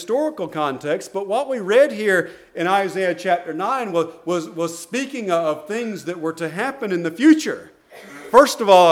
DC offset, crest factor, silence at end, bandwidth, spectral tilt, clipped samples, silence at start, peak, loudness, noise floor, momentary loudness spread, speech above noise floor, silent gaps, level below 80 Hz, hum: under 0.1%; 20 dB; 0 s; 16 kHz; -4.5 dB/octave; under 0.1%; 0 s; 0 dBFS; -20 LUFS; -41 dBFS; 12 LU; 22 dB; none; -64 dBFS; none